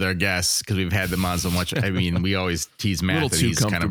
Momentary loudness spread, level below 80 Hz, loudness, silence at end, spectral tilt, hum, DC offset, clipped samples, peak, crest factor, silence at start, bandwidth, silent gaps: 4 LU; -42 dBFS; -22 LUFS; 0 s; -4 dB/octave; none; under 0.1%; under 0.1%; -6 dBFS; 16 dB; 0 s; 19 kHz; none